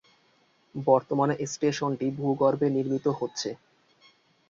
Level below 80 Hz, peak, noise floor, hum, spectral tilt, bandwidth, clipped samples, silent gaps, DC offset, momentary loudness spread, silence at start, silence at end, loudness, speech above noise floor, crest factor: -70 dBFS; -6 dBFS; -65 dBFS; none; -6 dB/octave; 7.6 kHz; under 0.1%; none; under 0.1%; 10 LU; 0.75 s; 0.95 s; -27 LUFS; 39 dB; 22 dB